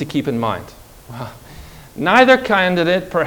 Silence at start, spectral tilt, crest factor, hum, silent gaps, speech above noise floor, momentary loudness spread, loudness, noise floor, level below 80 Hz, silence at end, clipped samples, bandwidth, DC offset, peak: 0 s; -5.5 dB/octave; 18 dB; none; none; 22 dB; 22 LU; -15 LUFS; -38 dBFS; -46 dBFS; 0 s; 0.1%; over 20 kHz; under 0.1%; 0 dBFS